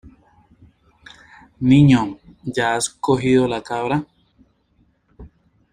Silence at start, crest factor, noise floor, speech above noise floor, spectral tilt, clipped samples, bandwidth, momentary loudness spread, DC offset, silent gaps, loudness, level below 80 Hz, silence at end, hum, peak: 0.05 s; 18 dB; -61 dBFS; 44 dB; -6 dB/octave; under 0.1%; 11.5 kHz; 15 LU; under 0.1%; none; -18 LUFS; -48 dBFS; 0.45 s; none; -2 dBFS